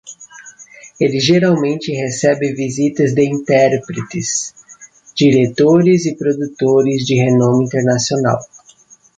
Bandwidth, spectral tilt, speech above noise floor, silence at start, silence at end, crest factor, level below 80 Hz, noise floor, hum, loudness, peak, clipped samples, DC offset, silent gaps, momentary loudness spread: 9.6 kHz; -5.5 dB/octave; 33 dB; 0.05 s; 0.7 s; 14 dB; -54 dBFS; -47 dBFS; none; -14 LUFS; 0 dBFS; under 0.1%; under 0.1%; none; 9 LU